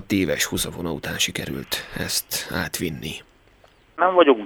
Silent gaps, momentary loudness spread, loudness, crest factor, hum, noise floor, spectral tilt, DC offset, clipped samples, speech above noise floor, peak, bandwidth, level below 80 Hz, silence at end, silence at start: none; 12 LU; -23 LUFS; 22 dB; none; -55 dBFS; -3.5 dB/octave; under 0.1%; under 0.1%; 32 dB; -2 dBFS; over 20 kHz; -48 dBFS; 0 s; 0 s